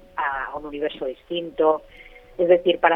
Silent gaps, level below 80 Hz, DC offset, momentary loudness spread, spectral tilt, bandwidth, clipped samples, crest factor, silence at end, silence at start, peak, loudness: none; -52 dBFS; under 0.1%; 13 LU; -7 dB/octave; 4 kHz; under 0.1%; 20 dB; 0 s; 0.15 s; -2 dBFS; -23 LUFS